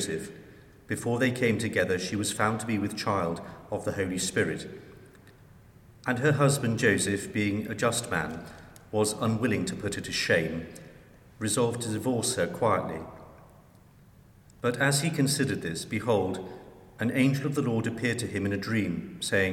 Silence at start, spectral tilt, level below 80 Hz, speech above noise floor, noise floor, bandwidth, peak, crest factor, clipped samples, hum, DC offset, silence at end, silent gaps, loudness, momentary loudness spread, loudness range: 0 s; -4.5 dB/octave; -58 dBFS; 27 dB; -55 dBFS; 17 kHz; -8 dBFS; 20 dB; under 0.1%; none; under 0.1%; 0 s; none; -28 LUFS; 12 LU; 3 LU